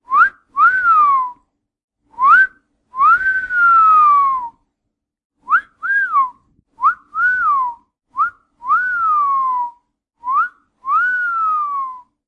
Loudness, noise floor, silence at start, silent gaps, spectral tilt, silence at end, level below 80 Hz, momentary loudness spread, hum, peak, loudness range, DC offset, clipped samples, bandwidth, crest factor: -14 LUFS; -77 dBFS; 0.1 s; 1.84-1.88 s, 5.25-5.30 s; -2.5 dB/octave; 0.3 s; -58 dBFS; 14 LU; none; -2 dBFS; 5 LU; under 0.1%; under 0.1%; 7.8 kHz; 14 dB